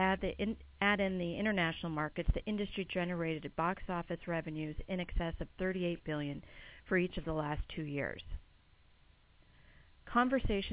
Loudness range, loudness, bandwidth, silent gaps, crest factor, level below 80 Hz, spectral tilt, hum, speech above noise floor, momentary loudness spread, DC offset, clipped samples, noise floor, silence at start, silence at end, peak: 5 LU; -36 LUFS; 4 kHz; none; 20 dB; -46 dBFS; -4.5 dB/octave; none; 29 dB; 9 LU; under 0.1%; under 0.1%; -65 dBFS; 0 s; 0 s; -16 dBFS